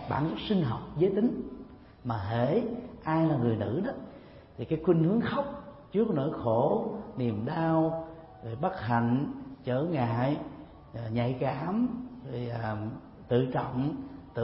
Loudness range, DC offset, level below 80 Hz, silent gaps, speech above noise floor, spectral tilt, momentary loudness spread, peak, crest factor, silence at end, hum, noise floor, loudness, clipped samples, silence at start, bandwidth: 3 LU; under 0.1%; -56 dBFS; none; 21 dB; -11.5 dB/octave; 16 LU; -12 dBFS; 18 dB; 0 s; none; -50 dBFS; -30 LUFS; under 0.1%; 0 s; 5.8 kHz